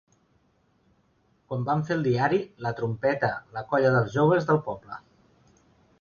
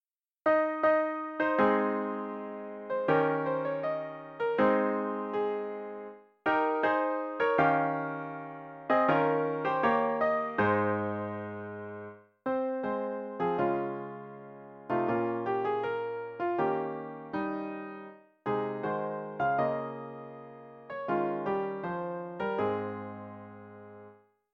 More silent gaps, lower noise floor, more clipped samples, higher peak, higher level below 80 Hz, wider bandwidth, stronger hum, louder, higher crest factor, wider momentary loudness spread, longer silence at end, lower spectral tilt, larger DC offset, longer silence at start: neither; first, -67 dBFS vs -57 dBFS; neither; about the same, -10 dBFS vs -12 dBFS; first, -62 dBFS vs -70 dBFS; first, 7 kHz vs 6.2 kHz; neither; first, -26 LUFS vs -31 LUFS; about the same, 18 dB vs 20 dB; second, 13 LU vs 17 LU; first, 1 s vs 0.4 s; about the same, -8 dB/octave vs -8.5 dB/octave; neither; first, 1.5 s vs 0.45 s